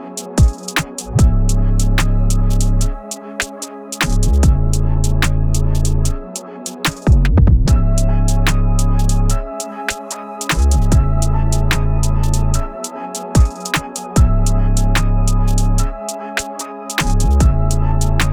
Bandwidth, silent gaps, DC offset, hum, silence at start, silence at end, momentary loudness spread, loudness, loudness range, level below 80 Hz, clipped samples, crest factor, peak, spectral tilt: 19 kHz; none; under 0.1%; none; 0 s; 0 s; 10 LU; -17 LUFS; 2 LU; -16 dBFS; under 0.1%; 12 dB; -2 dBFS; -5 dB/octave